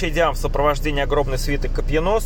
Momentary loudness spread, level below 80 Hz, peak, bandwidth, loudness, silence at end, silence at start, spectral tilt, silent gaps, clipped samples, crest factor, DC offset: 4 LU; -24 dBFS; -4 dBFS; 17.5 kHz; -21 LUFS; 0 s; 0 s; -5 dB/octave; none; under 0.1%; 14 dB; under 0.1%